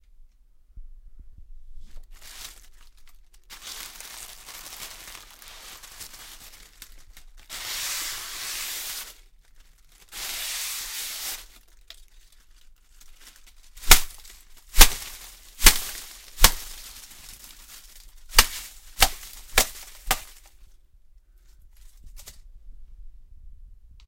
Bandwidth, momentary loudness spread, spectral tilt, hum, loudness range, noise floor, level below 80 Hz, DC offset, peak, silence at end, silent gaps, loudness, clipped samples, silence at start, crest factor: 17 kHz; 27 LU; -0.5 dB/octave; none; 19 LU; -55 dBFS; -32 dBFS; under 0.1%; 0 dBFS; 0.35 s; none; -23 LUFS; under 0.1%; 0.75 s; 28 dB